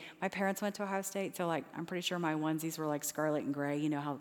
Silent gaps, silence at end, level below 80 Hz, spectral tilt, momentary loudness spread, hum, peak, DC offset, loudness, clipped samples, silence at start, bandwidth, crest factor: none; 0 s; -84 dBFS; -4.5 dB/octave; 3 LU; none; -20 dBFS; under 0.1%; -36 LUFS; under 0.1%; 0 s; over 20 kHz; 16 dB